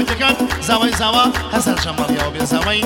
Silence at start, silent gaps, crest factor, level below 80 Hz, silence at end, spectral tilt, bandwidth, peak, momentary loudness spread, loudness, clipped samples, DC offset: 0 s; none; 16 dB; -32 dBFS; 0 s; -3.5 dB/octave; over 20 kHz; 0 dBFS; 5 LU; -16 LUFS; under 0.1%; under 0.1%